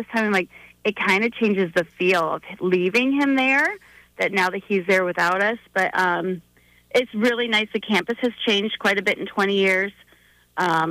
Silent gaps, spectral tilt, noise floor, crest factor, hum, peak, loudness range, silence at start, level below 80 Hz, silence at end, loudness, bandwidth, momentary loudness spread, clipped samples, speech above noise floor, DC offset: none; -4.5 dB/octave; -56 dBFS; 14 dB; 60 Hz at -50 dBFS; -8 dBFS; 2 LU; 0 s; -64 dBFS; 0 s; -21 LUFS; 15.5 kHz; 7 LU; under 0.1%; 35 dB; under 0.1%